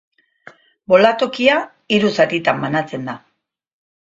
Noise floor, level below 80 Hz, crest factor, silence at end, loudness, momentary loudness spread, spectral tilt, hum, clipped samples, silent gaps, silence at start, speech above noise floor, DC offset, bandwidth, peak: -46 dBFS; -60 dBFS; 18 dB; 1 s; -16 LUFS; 14 LU; -5.5 dB/octave; none; under 0.1%; none; 0.9 s; 30 dB; under 0.1%; 7.8 kHz; 0 dBFS